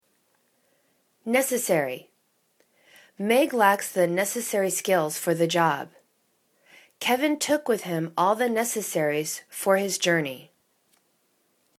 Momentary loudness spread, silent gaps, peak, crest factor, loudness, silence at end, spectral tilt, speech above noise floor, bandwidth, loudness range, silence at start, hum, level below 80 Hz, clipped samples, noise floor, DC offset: 10 LU; none; -4 dBFS; 22 dB; -24 LUFS; 1.35 s; -3.5 dB/octave; 45 dB; 19 kHz; 3 LU; 1.25 s; none; -76 dBFS; under 0.1%; -69 dBFS; under 0.1%